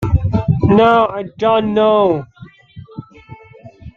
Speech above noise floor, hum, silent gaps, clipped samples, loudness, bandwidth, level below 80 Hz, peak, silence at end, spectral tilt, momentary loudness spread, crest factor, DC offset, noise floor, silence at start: 27 dB; none; none; under 0.1%; -14 LUFS; 7 kHz; -34 dBFS; -2 dBFS; 0.05 s; -9 dB/octave; 24 LU; 14 dB; under 0.1%; -40 dBFS; 0 s